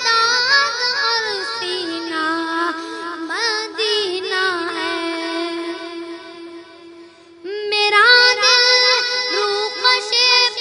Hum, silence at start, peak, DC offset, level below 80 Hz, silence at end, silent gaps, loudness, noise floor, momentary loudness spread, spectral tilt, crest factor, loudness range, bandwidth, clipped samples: none; 0 s; 0 dBFS; under 0.1%; -74 dBFS; 0 s; none; -15 LUFS; -42 dBFS; 17 LU; 0 dB/octave; 18 dB; 10 LU; 11 kHz; under 0.1%